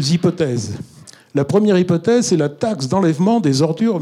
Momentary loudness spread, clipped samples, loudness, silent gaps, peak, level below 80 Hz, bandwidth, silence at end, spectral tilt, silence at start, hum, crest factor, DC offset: 9 LU; under 0.1%; -17 LUFS; none; -2 dBFS; -58 dBFS; 13 kHz; 0 s; -6 dB/octave; 0 s; none; 14 dB; under 0.1%